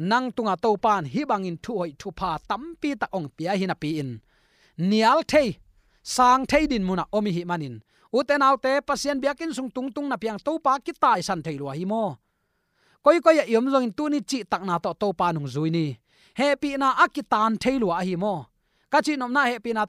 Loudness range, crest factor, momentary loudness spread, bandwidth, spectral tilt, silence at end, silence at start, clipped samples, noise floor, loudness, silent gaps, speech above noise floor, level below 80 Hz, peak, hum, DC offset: 4 LU; 20 dB; 11 LU; 15.5 kHz; -5 dB/octave; 0 s; 0 s; under 0.1%; -73 dBFS; -24 LUFS; none; 49 dB; -54 dBFS; -4 dBFS; none; under 0.1%